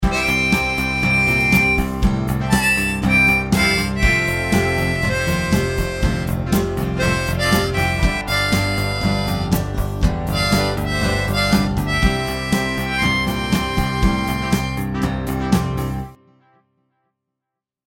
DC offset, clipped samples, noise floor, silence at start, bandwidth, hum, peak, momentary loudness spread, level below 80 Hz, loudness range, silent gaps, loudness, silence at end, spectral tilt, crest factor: under 0.1%; under 0.1%; -83 dBFS; 0 s; 17 kHz; none; -2 dBFS; 6 LU; -28 dBFS; 5 LU; none; -18 LUFS; 1.8 s; -5 dB/octave; 16 dB